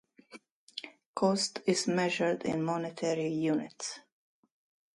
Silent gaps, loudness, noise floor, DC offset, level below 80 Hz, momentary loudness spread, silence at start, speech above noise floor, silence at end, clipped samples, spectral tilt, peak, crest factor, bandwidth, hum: 0.51-0.67 s, 1.06-1.14 s; -31 LUFS; -56 dBFS; under 0.1%; -74 dBFS; 15 LU; 0.3 s; 25 dB; 0.95 s; under 0.1%; -4.5 dB/octave; -14 dBFS; 18 dB; 11.5 kHz; none